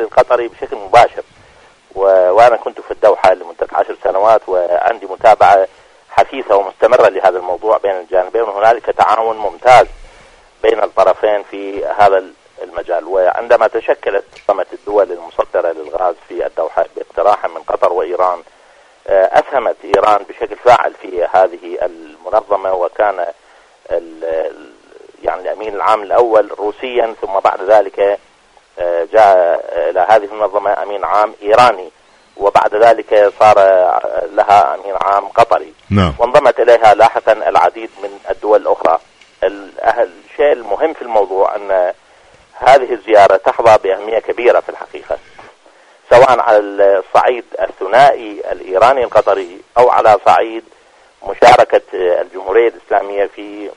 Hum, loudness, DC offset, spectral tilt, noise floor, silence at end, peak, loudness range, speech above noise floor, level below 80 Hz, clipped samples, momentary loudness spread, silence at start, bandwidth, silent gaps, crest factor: none; -12 LUFS; under 0.1%; -5 dB/octave; -48 dBFS; 0.05 s; 0 dBFS; 6 LU; 36 dB; -44 dBFS; 0.4%; 13 LU; 0 s; 11 kHz; none; 12 dB